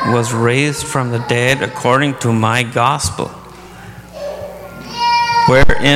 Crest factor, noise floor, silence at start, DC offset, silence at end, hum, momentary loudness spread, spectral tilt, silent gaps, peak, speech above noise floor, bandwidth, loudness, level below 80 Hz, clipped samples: 14 dB; -34 dBFS; 0 s; under 0.1%; 0 s; none; 21 LU; -4.5 dB/octave; none; 0 dBFS; 21 dB; 16 kHz; -14 LUFS; -30 dBFS; under 0.1%